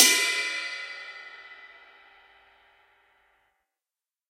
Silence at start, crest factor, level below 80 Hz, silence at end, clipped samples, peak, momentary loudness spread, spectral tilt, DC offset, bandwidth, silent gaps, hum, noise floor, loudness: 0 s; 30 dB; -84 dBFS; 2.65 s; under 0.1%; -2 dBFS; 25 LU; 3.5 dB/octave; under 0.1%; 15.5 kHz; none; none; under -90 dBFS; -25 LUFS